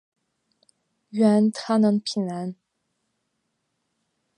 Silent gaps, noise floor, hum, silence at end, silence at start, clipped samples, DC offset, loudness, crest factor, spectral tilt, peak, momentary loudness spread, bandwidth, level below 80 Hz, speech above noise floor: none; -76 dBFS; none; 1.85 s; 1.15 s; under 0.1%; under 0.1%; -22 LUFS; 18 dB; -6.5 dB/octave; -8 dBFS; 14 LU; 10.5 kHz; -74 dBFS; 55 dB